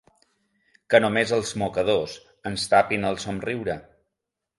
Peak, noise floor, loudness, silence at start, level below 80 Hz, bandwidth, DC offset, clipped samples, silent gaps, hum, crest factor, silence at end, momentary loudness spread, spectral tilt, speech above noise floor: -2 dBFS; -84 dBFS; -23 LUFS; 0.9 s; -56 dBFS; 11.5 kHz; under 0.1%; under 0.1%; none; none; 22 dB; 0.75 s; 12 LU; -4.5 dB/octave; 61 dB